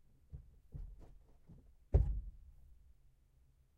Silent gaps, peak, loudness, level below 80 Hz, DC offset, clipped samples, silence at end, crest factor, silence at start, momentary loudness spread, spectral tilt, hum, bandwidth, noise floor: none; -18 dBFS; -39 LUFS; -44 dBFS; under 0.1%; under 0.1%; 1.05 s; 24 dB; 0.35 s; 28 LU; -10.5 dB/octave; none; 2.5 kHz; -70 dBFS